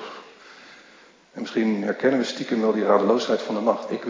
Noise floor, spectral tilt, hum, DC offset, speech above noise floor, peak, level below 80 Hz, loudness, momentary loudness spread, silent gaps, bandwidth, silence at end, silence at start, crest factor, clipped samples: -52 dBFS; -5.5 dB/octave; none; under 0.1%; 30 dB; -4 dBFS; -80 dBFS; -23 LUFS; 17 LU; none; 7.6 kHz; 0 s; 0 s; 20 dB; under 0.1%